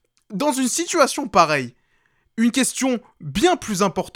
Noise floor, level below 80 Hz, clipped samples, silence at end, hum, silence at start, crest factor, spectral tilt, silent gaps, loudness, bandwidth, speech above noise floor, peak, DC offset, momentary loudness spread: -64 dBFS; -50 dBFS; under 0.1%; 0.05 s; none; 0.3 s; 22 dB; -3.5 dB/octave; none; -20 LUFS; 17 kHz; 44 dB; 0 dBFS; under 0.1%; 11 LU